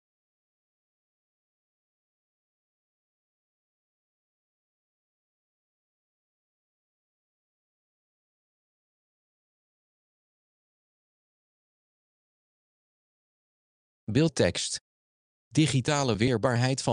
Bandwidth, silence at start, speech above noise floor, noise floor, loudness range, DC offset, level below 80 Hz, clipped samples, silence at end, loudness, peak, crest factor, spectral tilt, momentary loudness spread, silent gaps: 10.5 kHz; 14.1 s; over 65 dB; under -90 dBFS; 6 LU; under 0.1%; -64 dBFS; under 0.1%; 0 s; -26 LUFS; -8 dBFS; 26 dB; -5 dB/octave; 7 LU; 14.81-15.51 s